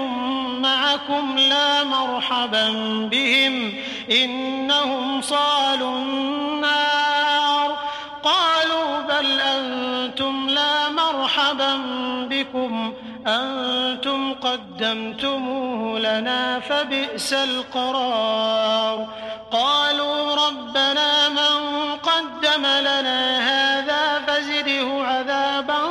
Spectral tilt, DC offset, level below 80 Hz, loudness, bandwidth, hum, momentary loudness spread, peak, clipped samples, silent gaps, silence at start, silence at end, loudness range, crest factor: -2 dB/octave; under 0.1%; -64 dBFS; -20 LUFS; 13.5 kHz; none; 7 LU; -8 dBFS; under 0.1%; none; 0 s; 0 s; 4 LU; 14 dB